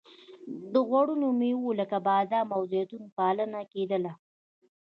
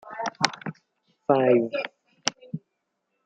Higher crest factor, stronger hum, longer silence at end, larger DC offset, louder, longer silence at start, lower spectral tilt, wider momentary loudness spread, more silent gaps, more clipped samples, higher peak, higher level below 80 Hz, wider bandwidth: second, 16 dB vs 26 dB; neither; about the same, 0.75 s vs 0.65 s; neither; second, -29 LUFS vs -25 LUFS; first, 0.3 s vs 0.05 s; first, -9 dB/octave vs -4 dB/octave; second, 11 LU vs 19 LU; first, 3.12-3.16 s vs none; neither; second, -12 dBFS vs 0 dBFS; second, -82 dBFS vs -76 dBFS; second, 5.6 kHz vs 9.4 kHz